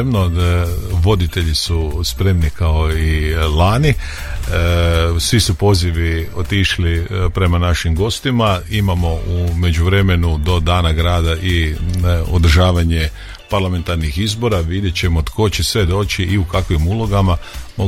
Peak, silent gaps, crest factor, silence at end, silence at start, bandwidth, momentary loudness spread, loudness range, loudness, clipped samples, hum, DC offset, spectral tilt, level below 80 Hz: -2 dBFS; none; 14 dB; 0 s; 0 s; 15 kHz; 5 LU; 2 LU; -16 LUFS; under 0.1%; none; under 0.1%; -5.5 dB/octave; -22 dBFS